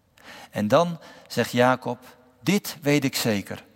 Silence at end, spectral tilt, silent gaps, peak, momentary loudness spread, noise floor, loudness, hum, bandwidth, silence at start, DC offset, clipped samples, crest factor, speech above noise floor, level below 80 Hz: 0.15 s; -5 dB/octave; none; -4 dBFS; 14 LU; -47 dBFS; -24 LUFS; none; 16.5 kHz; 0.25 s; under 0.1%; under 0.1%; 20 dB; 23 dB; -68 dBFS